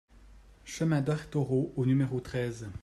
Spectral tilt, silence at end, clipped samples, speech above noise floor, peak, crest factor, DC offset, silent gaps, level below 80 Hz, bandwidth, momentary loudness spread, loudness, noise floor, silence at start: -7.5 dB/octave; 0 s; under 0.1%; 25 dB; -16 dBFS; 14 dB; under 0.1%; none; -56 dBFS; 12.5 kHz; 7 LU; -31 LUFS; -55 dBFS; 0.15 s